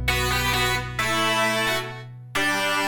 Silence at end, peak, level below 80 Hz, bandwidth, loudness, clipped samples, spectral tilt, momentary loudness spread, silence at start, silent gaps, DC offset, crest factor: 0 s; -10 dBFS; -38 dBFS; 19 kHz; -22 LUFS; under 0.1%; -3 dB/octave; 8 LU; 0 s; none; under 0.1%; 14 dB